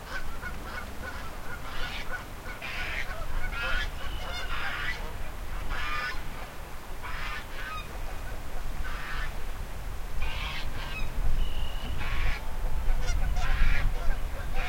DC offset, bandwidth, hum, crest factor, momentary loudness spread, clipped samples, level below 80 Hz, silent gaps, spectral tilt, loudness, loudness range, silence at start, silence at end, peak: under 0.1%; 16 kHz; none; 18 dB; 9 LU; under 0.1%; -32 dBFS; none; -4 dB/octave; -35 LUFS; 5 LU; 0 s; 0 s; -10 dBFS